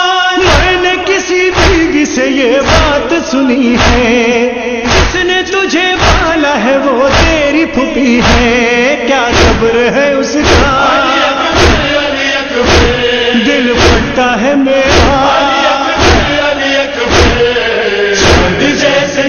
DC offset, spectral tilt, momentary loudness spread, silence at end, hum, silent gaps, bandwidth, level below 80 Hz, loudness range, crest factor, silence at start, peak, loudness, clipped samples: under 0.1%; -4 dB/octave; 3 LU; 0 s; none; none; 11.5 kHz; -20 dBFS; 1 LU; 8 dB; 0 s; 0 dBFS; -8 LUFS; 0.2%